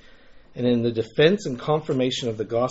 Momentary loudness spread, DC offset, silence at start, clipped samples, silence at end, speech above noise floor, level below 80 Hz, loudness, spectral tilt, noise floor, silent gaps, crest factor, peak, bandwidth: 7 LU; under 0.1%; 0.3 s; under 0.1%; 0 s; 25 dB; -54 dBFS; -23 LUFS; -5 dB/octave; -48 dBFS; none; 18 dB; -4 dBFS; 8 kHz